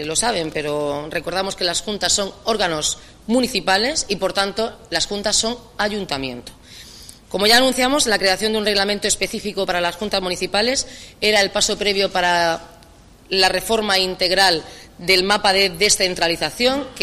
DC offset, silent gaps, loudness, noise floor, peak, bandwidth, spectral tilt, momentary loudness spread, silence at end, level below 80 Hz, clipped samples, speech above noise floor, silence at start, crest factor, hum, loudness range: under 0.1%; none; -18 LUFS; -46 dBFS; -2 dBFS; 15.5 kHz; -2 dB/octave; 10 LU; 0 s; -44 dBFS; under 0.1%; 27 dB; 0 s; 18 dB; none; 4 LU